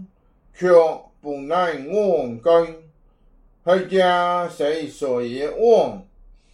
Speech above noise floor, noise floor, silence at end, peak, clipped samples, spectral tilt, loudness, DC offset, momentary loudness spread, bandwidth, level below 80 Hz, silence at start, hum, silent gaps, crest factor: 37 dB; -55 dBFS; 0.5 s; -4 dBFS; under 0.1%; -5.5 dB/octave; -20 LUFS; under 0.1%; 13 LU; 11 kHz; -54 dBFS; 0 s; none; none; 18 dB